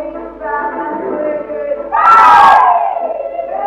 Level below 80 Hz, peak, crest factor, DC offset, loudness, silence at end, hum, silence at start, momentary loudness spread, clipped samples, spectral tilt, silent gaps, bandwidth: -46 dBFS; 0 dBFS; 12 dB; under 0.1%; -11 LUFS; 0 s; none; 0 s; 16 LU; 0.4%; -4 dB/octave; none; 13.5 kHz